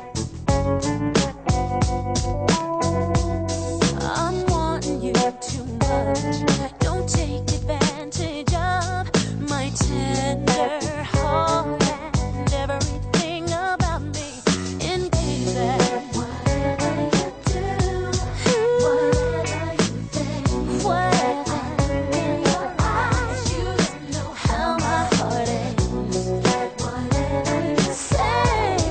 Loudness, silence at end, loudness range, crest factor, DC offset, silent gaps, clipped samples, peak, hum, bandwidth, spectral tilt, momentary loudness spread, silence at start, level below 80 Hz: -22 LUFS; 0 s; 2 LU; 18 dB; under 0.1%; none; under 0.1%; -4 dBFS; none; 9.2 kHz; -5 dB/octave; 5 LU; 0 s; -32 dBFS